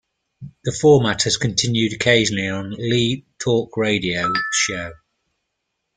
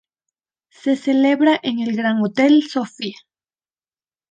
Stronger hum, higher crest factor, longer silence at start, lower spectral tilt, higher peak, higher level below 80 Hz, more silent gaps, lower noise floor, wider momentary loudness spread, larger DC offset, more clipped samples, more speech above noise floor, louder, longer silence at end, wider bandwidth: neither; about the same, 18 dB vs 16 dB; second, 0.4 s vs 0.85 s; second, -4 dB/octave vs -5.5 dB/octave; about the same, -2 dBFS vs -4 dBFS; first, -50 dBFS vs -72 dBFS; neither; second, -76 dBFS vs under -90 dBFS; about the same, 10 LU vs 12 LU; neither; neither; second, 57 dB vs over 73 dB; about the same, -19 LUFS vs -18 LUFS; about the same, 1.05 s vs 1.15 s; about the same, 9.6 kHz vs 9 kHz